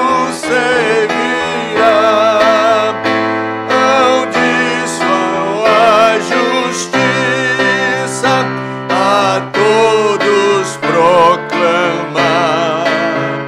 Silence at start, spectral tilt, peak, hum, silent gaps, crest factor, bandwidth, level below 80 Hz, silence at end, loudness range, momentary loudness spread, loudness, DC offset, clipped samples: 0 s; -4 dB/octave; 0 dBFS; none; none; 12 dB; 14.5 kHz; -52 dBFS; 0 s; 1 LU; 5 LU; -12 LUFS; under 0.1%; under 0.1%